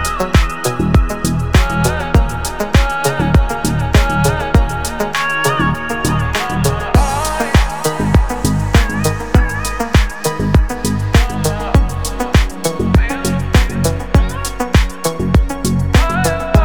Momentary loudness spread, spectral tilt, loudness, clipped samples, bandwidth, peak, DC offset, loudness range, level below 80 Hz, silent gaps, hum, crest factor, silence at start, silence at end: 5 LU; -5.5 dB/octave; -15 LUFS; under 0.1%; over 20 kHz; 0 dBFS; 3%; 1 LU; -18 dBFS; none; none; 14 dB; 0 s; 0 s